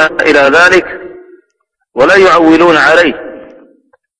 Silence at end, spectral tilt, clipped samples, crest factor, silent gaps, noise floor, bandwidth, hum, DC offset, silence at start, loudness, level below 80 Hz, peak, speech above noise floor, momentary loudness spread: 0.8 s; -4 dB/octave; 2%; 8 dB; none; -65 dBFS; 11 kHz; none; under 0.1%; 0 s; -6 LUFS; -42 dBFS; 0 dBFS; 58 dB; 19 LU